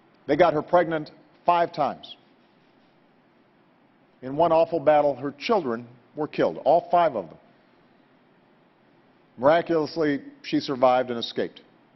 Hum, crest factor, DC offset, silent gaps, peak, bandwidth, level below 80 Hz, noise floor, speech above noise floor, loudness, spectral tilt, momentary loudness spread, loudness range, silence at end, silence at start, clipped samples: none; 20 dB; under 0.1%; none; -4 dBFS; 6.2 kHz; -64 dBFS; -60 dBFS; 37 dB; -24 LUFS; -7 dB/octave; 14 LU; 5 LU; 0.5 s; 0.3 s; under 0.1%